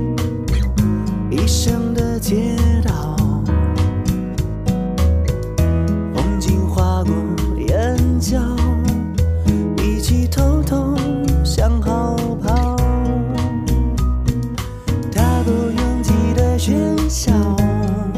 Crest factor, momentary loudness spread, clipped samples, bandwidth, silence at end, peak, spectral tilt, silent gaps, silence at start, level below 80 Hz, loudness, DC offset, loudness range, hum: 14 dB; 4 LU; under 0.1%; 15.5 kHz; 0 s; -2 dBFS; -6.5 dB/octave; none; 0 s; -22 dBFS; -18 LUFS; under 0.1%; 1 LU; none